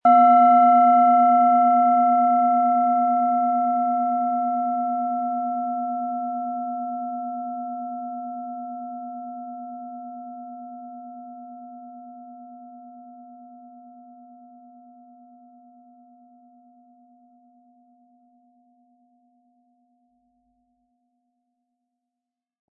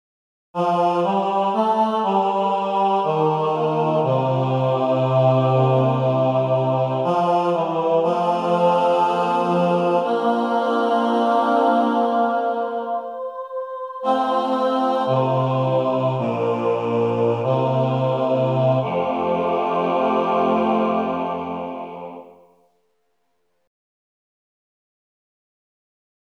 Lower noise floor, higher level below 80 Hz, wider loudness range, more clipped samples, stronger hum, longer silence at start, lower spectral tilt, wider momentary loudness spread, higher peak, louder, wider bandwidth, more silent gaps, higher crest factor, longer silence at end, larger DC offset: first, -87 dBFS vs -71 dBFS; second, under -90 dBFS vs -68 dBFS; first, 25 LU vs 4 LU; neither; neither; second, 0.05 s vs 0.55 s; first, -9.5 dB/octave vs -8 dB/octave; first, 26 LU vs 7 LU; about the same, -6 dBFS vs -6 dBFS; about the same, -20 LUFS vs -20 LUFS; second, 3.1 kHz vs 9.8 kHz; neither; about the same, 18 dB vs 14 dB; first, 9.15 s vs 3.9 s; neither